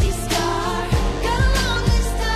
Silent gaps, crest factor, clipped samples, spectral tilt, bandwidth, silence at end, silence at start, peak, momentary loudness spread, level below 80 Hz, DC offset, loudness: none; 12 dB; under 0.1%; -4.5 dB/octave; 14.5 kHz; 0 s; 0 s; -6 dBFS; 3 LU; -22 dBFS; under 0.1%; -20 LUFS